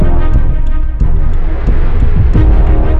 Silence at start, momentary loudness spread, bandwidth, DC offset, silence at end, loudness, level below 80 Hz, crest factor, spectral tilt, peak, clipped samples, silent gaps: 0 s; 7 LU; 3.6 kHz; under 0.1%; 0 s; -14 LUFS; -10 dBFS; 6 dB; -10 dB/octave; 0 dBFS; under 0.1%; none